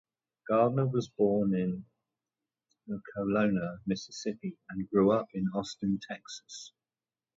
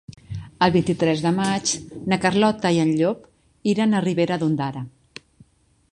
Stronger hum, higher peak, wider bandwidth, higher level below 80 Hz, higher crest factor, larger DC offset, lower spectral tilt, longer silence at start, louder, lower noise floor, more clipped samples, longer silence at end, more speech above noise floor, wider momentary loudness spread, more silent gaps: neither; second, -14 dBFS vs -2 dBFS; second, 7.8 kHz vs 11 kHz; second, -66 dBFS vs -54 dBFS; about the same, 18 dB vs 20 dB; neither; first, -7 dB/octave vs -5 dB/octave; first, 0.45 s vs 0.1 s; second, -31 LUFS vs -21 LUFS; first, under -90 dBFS vs -57 dBFS; neither; second, 0.7 s vs 1.05 s; first, over 59 dB vs 37 dB; about the same, 15 LU vs 16 LU; neither